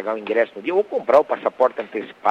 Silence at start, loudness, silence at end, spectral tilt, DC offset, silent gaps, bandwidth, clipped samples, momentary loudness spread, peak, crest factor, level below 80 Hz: 0 s; -20 LUFS; 0 s; -6 dB/octave; under 0.1%; none; 7.6 kHz; under 0.1%; 7 LU; -2 dBFS; 18 dB; -68 dBFS